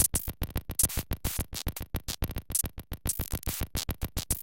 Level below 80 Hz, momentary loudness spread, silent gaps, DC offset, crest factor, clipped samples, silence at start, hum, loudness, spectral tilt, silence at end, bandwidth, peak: -38 dBFS; 9 LU; none; under 0.1%; 22 dB; under 0.1%; 0 s; none; -32 LUFS; -3 dB/octave; 0 s; 17 kHz; -10 dBFS